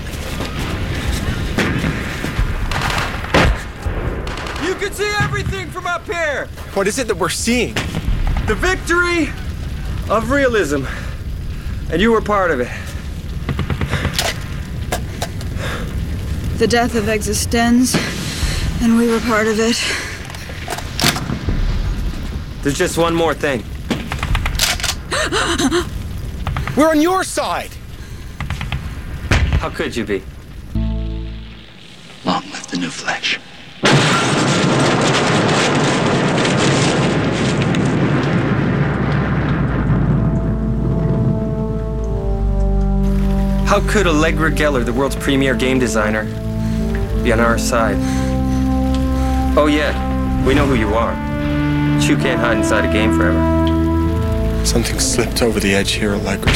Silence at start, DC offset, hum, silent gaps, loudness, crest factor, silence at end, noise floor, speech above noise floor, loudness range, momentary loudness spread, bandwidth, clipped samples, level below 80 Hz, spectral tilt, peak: 0 s; 0.7%; none; none; -17 LUFS; 16 dB; 0 s; -38 dBFS; 23 dB; 6 LU; 11 LU; 16.5 kHz; under 0.1%; -24 dBFS; -5 dB/octave; -2 dBFS